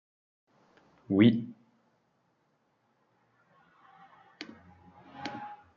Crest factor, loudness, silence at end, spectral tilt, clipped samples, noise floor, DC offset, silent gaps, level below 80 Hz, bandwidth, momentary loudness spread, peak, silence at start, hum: 24 dB; -28 LUFS; 0.2 s; -6 dB/octave; under 0.1%; -74 dBFS; under 0.1%; none; -78 dBFS; 6.8 kHz; 24 LU; -10 dBFS; 1.1 s; none